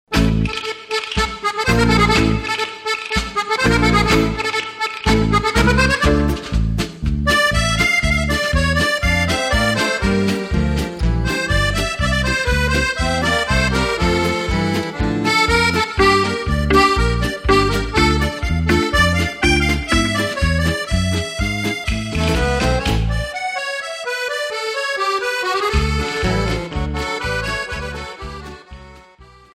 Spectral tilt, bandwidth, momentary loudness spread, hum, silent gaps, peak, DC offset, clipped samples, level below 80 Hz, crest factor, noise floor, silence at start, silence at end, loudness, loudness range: -4.5 dB/octave; 16 kHz; 8 LU; none; none; -2 dBFS; under 0.1%; under 0.1%; -24 dBFS; 14 dB; -45 dBFS; 0.1 s; 0.3 s; -17 LUFS; 4 LU